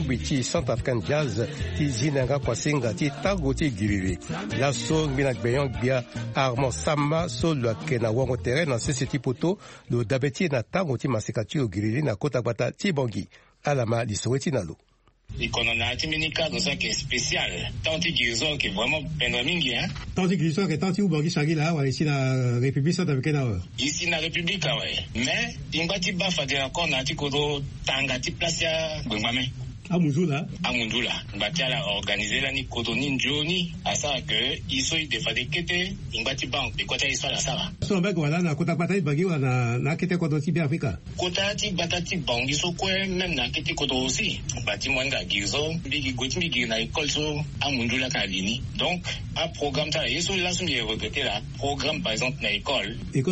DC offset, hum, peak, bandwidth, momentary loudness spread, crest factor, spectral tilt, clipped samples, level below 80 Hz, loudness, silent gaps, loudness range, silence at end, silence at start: under 0.1%; none; -8 dBFS; 8.4 kHz; 4 LU; 18 dB; -4.5 dB/octave; under 0.1%; -44 dBFS; -25 LUFS; none; 2 LU; 0 s; 0 s